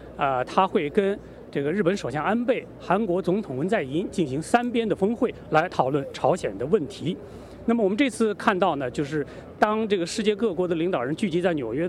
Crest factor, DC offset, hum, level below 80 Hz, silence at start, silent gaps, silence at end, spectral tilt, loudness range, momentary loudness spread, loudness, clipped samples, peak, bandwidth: 20 dB; under 0.1%; none; -54 dBFS; 0 s; none; 0 s; -6 dB/octave; 1 LU; 6 LU; -25 LUFS; under 0.1%; -4 dBFS; 12.5 kHz